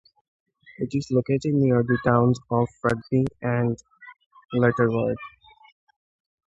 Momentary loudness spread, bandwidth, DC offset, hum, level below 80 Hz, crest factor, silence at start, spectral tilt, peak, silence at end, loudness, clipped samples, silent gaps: 9 LU; 8 kHz; under 0.1%; none; -54 dBFS; 20 dB; 0.8 s; -8.5 dB/octave; -4 dBFS; 1.2 s; -23 LUFS; under 0.1%; 4.26-4.31 s